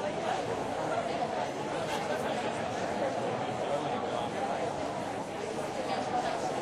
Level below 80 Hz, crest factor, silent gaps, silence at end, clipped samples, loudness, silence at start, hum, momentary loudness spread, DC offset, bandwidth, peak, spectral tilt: -64 dBFS; 14 dB; none; 0 s; under 0.1%; -33 LUFS; 0 s; none; 3 LU; under 0.1%; 15 kHz; -20 dBFS; -4.5 dB/octave